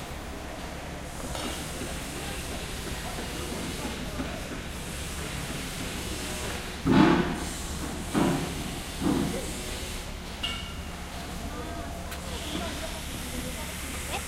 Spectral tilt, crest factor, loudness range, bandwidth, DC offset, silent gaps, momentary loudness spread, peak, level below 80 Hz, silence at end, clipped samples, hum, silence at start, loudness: -4.5 dB/octave; 26 dB; 8 LU; 16 kHz; under 0.1%; none; 11 LU; -6 dBFS; -40 dBFS; 0 s; under 0.1%; none; 0 s; -32 LUFS